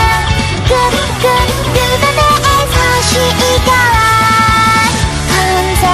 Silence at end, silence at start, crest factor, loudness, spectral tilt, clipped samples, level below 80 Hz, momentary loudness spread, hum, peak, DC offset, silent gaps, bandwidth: 0 s; 0 s; 10 dB; -10 LUFS; -3.5 dB/octave; under 0.1%; -20 dBFS; 4 LU; none; 0 dBFS; under 0.1%; none; 16 kHz